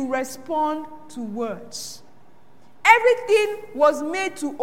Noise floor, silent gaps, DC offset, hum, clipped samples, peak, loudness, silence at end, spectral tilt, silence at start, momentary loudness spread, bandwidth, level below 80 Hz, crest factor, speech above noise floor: -55 dBFS; none; 0.8%; none; under 0.1%; 0 dBFS; -21 LUFS; 0 s; -3 dB/octave; 0 s; 18 LU; 16.5 kHz; -72 dBFS; 22 dB; 32 dB